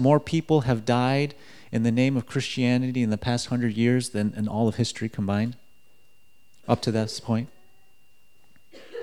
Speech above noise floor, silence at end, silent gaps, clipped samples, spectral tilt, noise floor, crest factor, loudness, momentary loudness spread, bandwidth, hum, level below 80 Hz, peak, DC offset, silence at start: 41 dB; 0 s; none; under 0.1%; -6.5 dB/octave; -65 dBFS; 20 dB; -25 LUFS; 7 LU; 13 kHz; none; -56 dBFS; -6 dBFS; 0.4%; 0 s